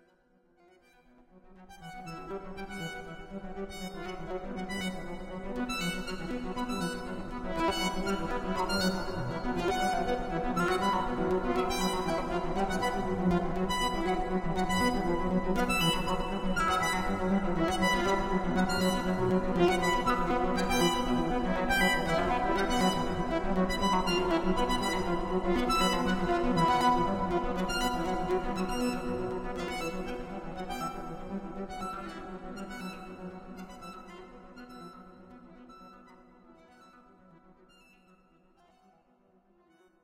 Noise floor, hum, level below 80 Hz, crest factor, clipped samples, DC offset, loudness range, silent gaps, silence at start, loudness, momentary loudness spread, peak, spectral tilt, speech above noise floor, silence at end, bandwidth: -66 dBFS; none; -42 dBFS; 18 dB; under 0.1%; under 0.1%; 14 LU; none; 1.35 s; -31 LUFS; 15 LU; -14 dBFS; -5 dB/octave; 29 dB; 3.2 s; 16 kHz